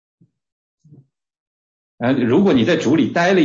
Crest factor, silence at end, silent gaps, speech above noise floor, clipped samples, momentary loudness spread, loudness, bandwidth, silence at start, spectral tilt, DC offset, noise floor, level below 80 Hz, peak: 14 dB; 0 s; none; 35 dB; under 0.1%; 5 LU; -16 LUFS; 7.6 kHz; 2 s; -6.5 dB/octave; under 0.1%; -50 dBFS; -58 dBFS; -4 dBFS